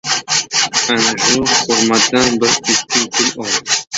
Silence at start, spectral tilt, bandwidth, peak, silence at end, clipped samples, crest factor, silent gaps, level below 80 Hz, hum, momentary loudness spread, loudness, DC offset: 0.05 s; -1 dB/octave; 8.2 kHz; 0 dBFS; 0 s; under 0.1%; 14 dB; none; -50 dBFS; none; 4 LU; -13 LUFS; under 0.1%